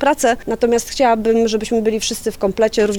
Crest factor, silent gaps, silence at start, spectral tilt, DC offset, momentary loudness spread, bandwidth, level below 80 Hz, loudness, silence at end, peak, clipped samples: 12 dB; none; 0 s; -3.5 dB/octave; under 0.1%; 5 LU; 19 kHz; -40 dBFS; -17 LUFS; 0 s; -4 dBFS; under 0.1%